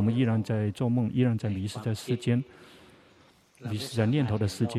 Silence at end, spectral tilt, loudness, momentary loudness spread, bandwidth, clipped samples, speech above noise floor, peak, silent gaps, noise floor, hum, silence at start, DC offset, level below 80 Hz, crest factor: 0 s; -7 dB/octave; -28 LUFS; 8 LU; 13.5 kHz; under 0.1%; 32 dB; -12 dBFS; none; -60 dBFS; none; 0 s; under 0.1%; -62 dBFS; 16 dB